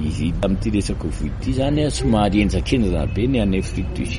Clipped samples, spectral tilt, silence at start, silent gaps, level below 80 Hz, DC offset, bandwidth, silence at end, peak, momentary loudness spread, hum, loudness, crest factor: under 0.1%; -6.5 dB/octave; 0 s; none; -26 dBFS; under 0.1%; 11.5 kHz; 0 s; -4 dBFS; 8 LU; none; -20 LUFS; 16 dB